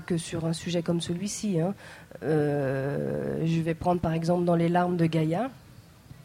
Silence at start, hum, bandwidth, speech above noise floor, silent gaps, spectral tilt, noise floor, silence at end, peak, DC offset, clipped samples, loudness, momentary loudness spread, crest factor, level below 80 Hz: 0 s; none; 13.5 kHz; 23 dB; none; -6.5 dB/octave; -50 dBFS; 0.1 s; -12 dBFS; under 0.1%; under 0.1%; -28 LUFS; 7 LU; 14 dB; -54 dBFS